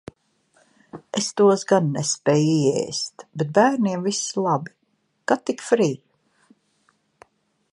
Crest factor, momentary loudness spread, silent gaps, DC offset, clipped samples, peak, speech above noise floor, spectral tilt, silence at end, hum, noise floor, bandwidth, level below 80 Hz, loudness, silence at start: 20 dB; 11 LU; none; under 0.1%; under 0.1%; -2 dBFS; 49 dB; -5 dB/octave; 1.75 s; none; -69 dBFS; 11 kHz; -68 dBFS; -21 LUFS; 0.95 s